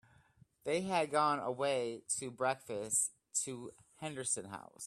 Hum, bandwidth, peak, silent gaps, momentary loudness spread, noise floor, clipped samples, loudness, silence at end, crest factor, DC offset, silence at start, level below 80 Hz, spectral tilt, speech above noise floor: none; 15.5 kHz; -18 dBFS; none; 14 LU; -67 dBFS; under 0.1%; -36 LUFS; 0 s; 20 dB; under 0.1%; 0.65 s; -78 dBFS; -2.5 dB/octave; 30 dB